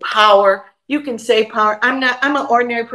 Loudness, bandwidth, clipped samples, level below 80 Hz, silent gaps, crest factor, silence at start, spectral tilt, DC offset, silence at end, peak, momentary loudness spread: -15 LUFS; 12.5 kHz; under 0.1%; -70 dBFS; none; 14 dB; 0 s; -3 dB/octave; under 0.1%; 0 s; 0 dBFS; 12 LU